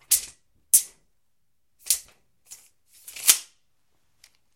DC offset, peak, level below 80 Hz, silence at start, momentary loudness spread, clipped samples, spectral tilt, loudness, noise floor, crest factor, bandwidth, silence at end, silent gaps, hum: under 0.1%; 0 dBFS; -68 dBFS; 0.1 s; 21 LU; under 0.1%; 4 dB/octave; -21 LUFS; -79 dBFS; 28 dB; 17 kHz; 1.15 s; none; none